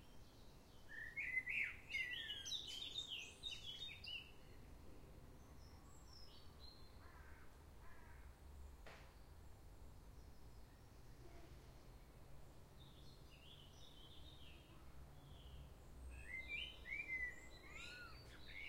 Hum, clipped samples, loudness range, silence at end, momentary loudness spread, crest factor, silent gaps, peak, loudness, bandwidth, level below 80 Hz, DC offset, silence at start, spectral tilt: none; under 0.1%; 17 LU; 0 s; 19 LU; 22 dB; none; -32 dBFS; -50 LUFS; 16 kHz; -64 dBFS; under 0.1%; 0 s; -2 dB/octave